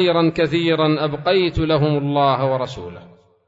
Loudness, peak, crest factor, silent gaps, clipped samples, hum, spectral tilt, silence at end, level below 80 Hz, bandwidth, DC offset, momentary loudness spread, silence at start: -18 LUFS; -4 dBFS; 14 dB; none; under 0.1%; none; -7.5 dB/octave; 0.5 s; -42 dBFS; 7.8 kHz; under 0.1%; 8 LU; 0 s